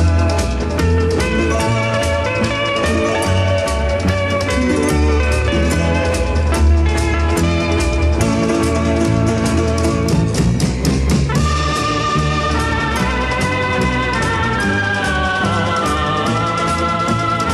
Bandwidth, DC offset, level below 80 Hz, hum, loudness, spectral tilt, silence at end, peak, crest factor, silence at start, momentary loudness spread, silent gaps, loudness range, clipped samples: 13 kHz; under 0.1%; -22 dBFS; none; -16 LUFS; -5.5 dB/octave; 0 s; -4 dBFS; 12 dB; 0 s; 2 LU; none; 1 LU; under 0.1%